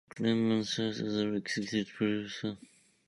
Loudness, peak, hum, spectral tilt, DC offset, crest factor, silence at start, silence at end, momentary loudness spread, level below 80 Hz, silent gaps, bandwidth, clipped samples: -33 LUFS; -16 dBFS; none; -5 dB/octave; under 0.1%; 18 dB; 0.15 s; 0.5 s; 9 LU; -70 dBFS; none; 11.5 kHz; under 0.1%